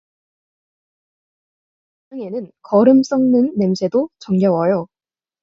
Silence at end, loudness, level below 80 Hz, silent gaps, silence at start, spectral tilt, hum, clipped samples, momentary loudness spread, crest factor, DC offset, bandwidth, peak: 0.55 s; -16 LUFS; -62 dBFS; none; 2.1 s; -8 dB/octave; none; under 0.1%; 17 LU; 18 dB; under 0.1%; 7.4 kHz; -2 dBFS